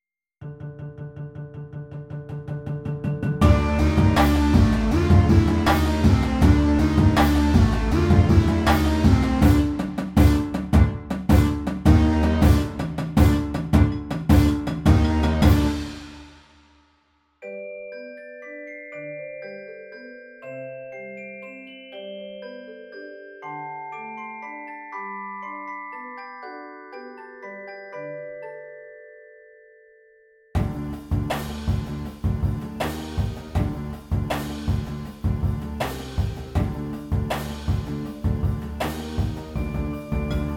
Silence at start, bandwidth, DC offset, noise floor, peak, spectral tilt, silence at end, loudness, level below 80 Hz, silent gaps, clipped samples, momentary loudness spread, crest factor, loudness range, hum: 0.4 s; 17 kHz; under 0.1%; -65 dBFS; -2 dBFS; -7 dB/octave; 0 s; -22 LUFS; -28 dBFS; none; under 0.1%; 20 LU; 20 dB; 19 LU; none